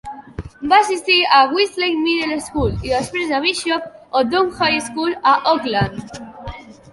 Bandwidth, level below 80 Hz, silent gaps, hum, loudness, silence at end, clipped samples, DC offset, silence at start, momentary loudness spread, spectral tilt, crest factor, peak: 11.5 kHz; -40 dBFS; none; none; -17 LUFS; 0.2 s; under 0.1%; under 0.1%; 0.05 s; 20 LU; -4 dB/octave; 16 dB; -2 dBFS